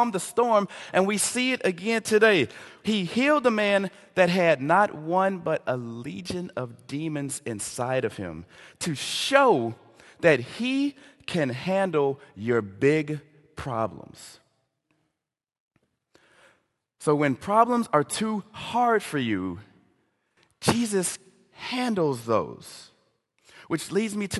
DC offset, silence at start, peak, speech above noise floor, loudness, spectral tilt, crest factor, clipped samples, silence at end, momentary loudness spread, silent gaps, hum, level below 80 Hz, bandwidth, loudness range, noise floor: under 0.1%; 0 s; -2 dBFS; 60 dB; -25 LUFS; -4.5 dB/octave; 24 dB; under 0.1%; 0 s; 14 LU; 15.60-15.71 s; none; -60 dBFS; 12.5 kHz; 8 LU; -85 dBFS